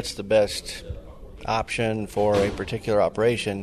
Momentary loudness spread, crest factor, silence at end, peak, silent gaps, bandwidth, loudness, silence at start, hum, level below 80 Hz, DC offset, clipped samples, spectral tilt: 14 LU; 16 dB; 0 s; -8 dBFS; none; 13.5 kHz; -24 LUFS; 0 s; none; -44 dBFS; under 0.1%; under 0.1%; -5 dB/octave